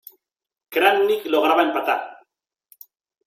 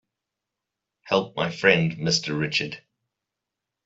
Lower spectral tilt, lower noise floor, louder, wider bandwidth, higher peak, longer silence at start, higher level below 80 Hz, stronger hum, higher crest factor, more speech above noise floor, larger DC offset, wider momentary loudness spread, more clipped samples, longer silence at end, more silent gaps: about the same, -3 dB/octave vs -4 dB/octave; second, -71 dBFS vs -85 dBFS; first, -19 LUFS vs -23 LUFS; first, 16.5 kHz vs 8 kHz; about the same, -4 dBFS vs -4 dBFS; second, 0.7 s vs 1.05 s; second, -72 dBFS vs -64 dBFS; neither; second, 18 dB vs 24 dB; second, 52 dB vs 62 dB; neither; about the same, 9 LU vs 10 LU; neither; about the same, 1.15 s vs 1.05 s; neither